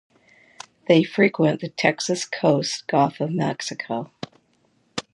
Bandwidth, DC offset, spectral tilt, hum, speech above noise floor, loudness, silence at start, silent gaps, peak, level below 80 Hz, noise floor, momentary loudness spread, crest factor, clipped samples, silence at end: 11.5 kHz; under 0.1%; -5 dB/octave; none; 43 dB; -22 LUFS; 0.9 s; none; -2 dBFS; -68 dBFS; -64 dBFS; 18 LU; 22 dB; under 0.1%; 0.15 s